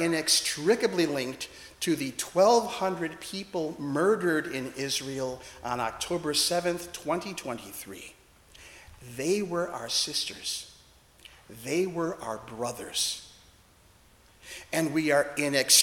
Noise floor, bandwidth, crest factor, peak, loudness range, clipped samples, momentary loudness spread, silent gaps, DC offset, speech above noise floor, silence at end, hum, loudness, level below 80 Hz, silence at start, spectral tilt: -59 dBFS; 18 kHz; 24 dB; -6 dBFS; 6 LU; under 0.1%; 17 LU; none; under 0.1%; 30 dB; 0 s; none; -28 LUFS; -62 dBFS; 0 s; -2.5 dB/octave